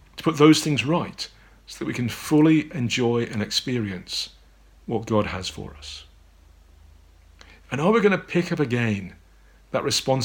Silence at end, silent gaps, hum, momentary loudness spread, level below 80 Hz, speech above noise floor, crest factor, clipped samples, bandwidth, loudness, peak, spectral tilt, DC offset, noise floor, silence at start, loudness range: 0 s; none; none; 18 LU; -52 dBFS; 31 dB; 22 dB; under 0.1%; 18.5 kHz; -23 LUFS; -2 dBFS; -5 dB/octave; under 0.1%; -53 dBFS; 0.15 s; 9 LU